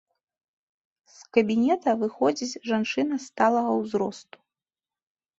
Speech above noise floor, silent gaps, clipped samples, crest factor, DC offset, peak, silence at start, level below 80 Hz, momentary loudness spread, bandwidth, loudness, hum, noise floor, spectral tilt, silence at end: over 66 dB; none; under 0.1%; 20 dB; under 0.1%; -6 dBFS; 1.2 s; -70 dBFS; 7 LU; 8 kHz; -25 LUFS; none; under -90 dBFS; -5 dB/octave; 1.2 s